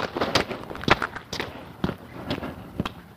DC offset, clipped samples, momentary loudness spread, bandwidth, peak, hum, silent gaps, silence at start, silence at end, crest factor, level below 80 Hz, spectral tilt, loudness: under 0.1%; under 0.1%; 11 LU; 15.5 kHz; -4 dBFS; none; none; 0 s; 0 s; 24 dB; -46 dBFS; -4.5 dB/octave; -28 LUFS